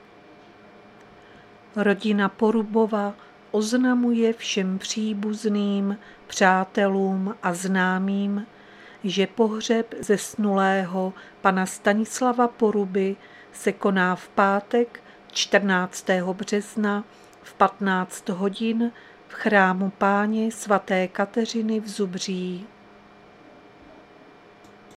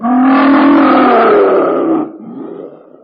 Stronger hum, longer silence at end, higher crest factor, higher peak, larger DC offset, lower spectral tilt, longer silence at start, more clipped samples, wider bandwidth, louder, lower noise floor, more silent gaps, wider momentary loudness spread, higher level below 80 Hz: neither; first, 2.3 s vs 0.35 s; first, 22 dB vs 10 dB; about the same, -2 dBFS vs 0 dBFS; neither; second, -5 dB/octave vs -10 dB/octave; first, 1.75 s vs 0 s; neither; first, 14 kHz vs 5.2 kHz; second, -24 LUFS vs -9 LUFS; first, -50 dBFS vs -30 dBFS; neither; second, 8 LU vs 20 LU; second, -68 dBFS vs -56 dBFS